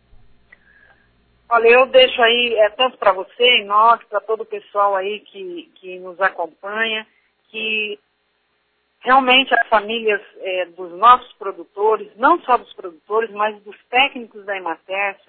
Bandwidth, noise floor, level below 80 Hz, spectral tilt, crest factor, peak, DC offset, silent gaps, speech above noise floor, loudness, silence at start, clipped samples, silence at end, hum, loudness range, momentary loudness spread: 4.5 kHz; -66 dBFS; -58 dBFS; -5.5 dB/octave; 18 dB; 0 dBFS; under 0.1%; none; 49 dB; -16 LUFS; 1.5 s; under 0.1%; 0.15 s; none; 9 LU; 19 LU